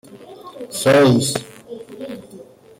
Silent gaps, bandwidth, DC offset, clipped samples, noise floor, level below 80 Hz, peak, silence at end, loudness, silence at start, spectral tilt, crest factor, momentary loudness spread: none; 16.5 kHz; under 0.1%; under 0.1%; -42 dBFS; -58 dBFS; -4 dBFS; 0.35 s; -16 LUFS; 0.15 s; -5 dB/octave; 16 dB; 24 LU